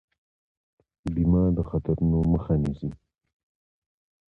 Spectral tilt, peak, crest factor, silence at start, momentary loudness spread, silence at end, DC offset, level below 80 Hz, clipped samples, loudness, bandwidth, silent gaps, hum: -11.5 dB/octave; -12 dBFS; 16 dB; 1.05 s; 13 LU; 1.35 s; under 0.1%; -38 dBFS; under 0.1%; -25 LUFS; 4.1 kHz; none; none